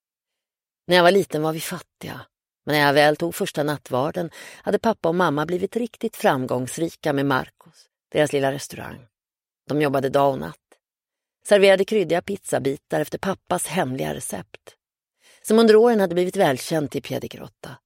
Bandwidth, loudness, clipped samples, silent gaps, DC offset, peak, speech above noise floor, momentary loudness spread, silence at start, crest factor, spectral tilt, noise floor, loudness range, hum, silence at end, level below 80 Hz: 16.5 kHz; -21 LUFS; under 0.1%; none; under 0.1%; -2 dBFS; over 69 dB; 19 LU; 0.9 s; 20 dB; -5 dB/octave; under -90 dBFS; 5 LU; none; 0.1 s; -60 dBFS